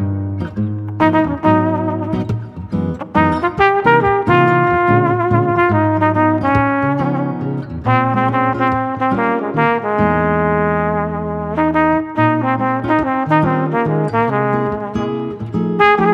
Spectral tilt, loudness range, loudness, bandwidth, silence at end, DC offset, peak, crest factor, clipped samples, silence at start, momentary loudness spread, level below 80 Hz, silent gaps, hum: -9 dB/octave; 3 LU; -16 LUFS; 7.2 kHz; 0 s; under 0.1%; 0 dBFS; 14 dB; under 0.1%; 0 s; 9 LU; -40 dBFS; none; none